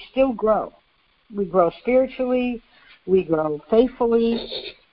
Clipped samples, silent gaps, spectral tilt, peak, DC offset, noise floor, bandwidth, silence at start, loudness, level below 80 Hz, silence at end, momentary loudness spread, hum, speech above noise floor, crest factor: under 0.1%; none; -11 dB/octave; -4 dBFS; under 0.1%; -62 dBFS; 5.4 kHz; 0 s; -21 LUFS; -50 dBFS; 0.2 s; 13 LU; none; 42 dB; 18 dB